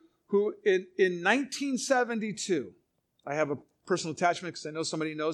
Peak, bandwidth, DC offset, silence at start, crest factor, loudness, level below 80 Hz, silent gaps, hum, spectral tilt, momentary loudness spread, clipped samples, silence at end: -8 dBFS; 12 kHz; under 0.1%; 0.3 s; 22 dB; -30 LUFS; -80 dBFS; none; none; -4 dB/octave; 9 LU; under 0.1%; 0 s